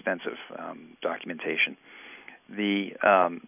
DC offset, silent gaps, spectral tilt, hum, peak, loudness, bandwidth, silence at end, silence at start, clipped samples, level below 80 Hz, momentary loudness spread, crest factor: under 0.1%; none; -8 dB/octave; none; -8 dBFS; -27 LUFS; 3.7 kHz; 0.1 s; 0.05 s; under 0.1%; -76 dBFS; 23 LU; 20 dB